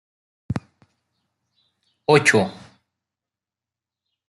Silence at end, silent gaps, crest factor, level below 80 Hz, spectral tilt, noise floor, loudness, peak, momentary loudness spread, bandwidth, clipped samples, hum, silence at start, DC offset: 1.75 s; none; 22 dB; -58 dBFS; -4.5 dB/octave; -89 dBFS; -20 LUFS; -2 dBFS; 16 LU; 12 kHz; under 0.1%; none; 0.5 s; under 0.1%